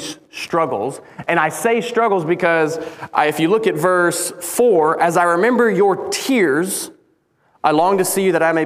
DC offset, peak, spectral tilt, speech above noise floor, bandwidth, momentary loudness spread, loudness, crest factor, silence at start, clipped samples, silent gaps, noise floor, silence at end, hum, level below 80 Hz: under 0.1%; 0 dBFS; -4 dB/octave; 44 dB; 16 kHz; 8 LU; -17 LUFS; 16 dB; 0 s; under 0.1%; none; -60 dBFS; 0 s; none; -64 dBFS